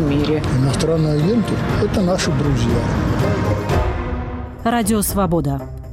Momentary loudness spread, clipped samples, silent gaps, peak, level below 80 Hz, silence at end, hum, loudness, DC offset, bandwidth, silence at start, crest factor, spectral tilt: 7 LU; under 0.1%; none; -8 dBFS; -28 dBFS; 0 s; none; -18 LUFS; under 0.1%; 16 kHz; 0 s; 10 dB; -6 dB/octave